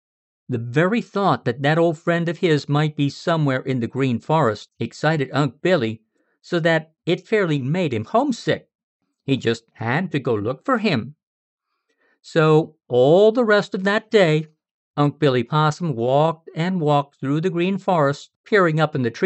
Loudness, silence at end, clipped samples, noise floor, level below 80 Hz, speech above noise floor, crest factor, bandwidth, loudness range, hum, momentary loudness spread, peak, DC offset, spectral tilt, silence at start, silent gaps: -20 LUFS; 0 s; under 0.1%; -68 dBFS; -74 dBFS; 49 dB; 16 dB; 8.2 kHz; 5 LU; none; 8 LU; -4 dBFS; under 0.1%; -7 dB/octave; 0.5 s; 8.75-9.00 s, 11.23-11.58 s, 14.71-14.94 s, 18.36-18.44 s